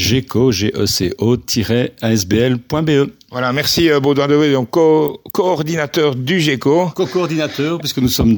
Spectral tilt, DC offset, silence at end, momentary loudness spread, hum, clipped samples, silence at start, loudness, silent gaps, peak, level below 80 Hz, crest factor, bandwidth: -5 dB/octave; under 0.1%; 0 s; 6 LU; none; under 0.1%; 0 s; -15 LUFS; none; 0 dBFS; -40 dBFS; 14 dB; 19.5 kHz